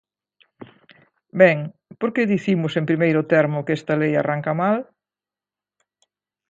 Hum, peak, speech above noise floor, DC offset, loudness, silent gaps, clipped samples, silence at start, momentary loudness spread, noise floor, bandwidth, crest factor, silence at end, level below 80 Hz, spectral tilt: 50 Hz at -45 dBFS; 0 dBFS; over 71 dB; under 0.1%; -20 LUFS; none; under 0.1%; 0.6 s; 10 LU; under -90 dBFS; 7.8 kHz; 22 dB; 1.65 s; -68 dBFS; -8 dB/octave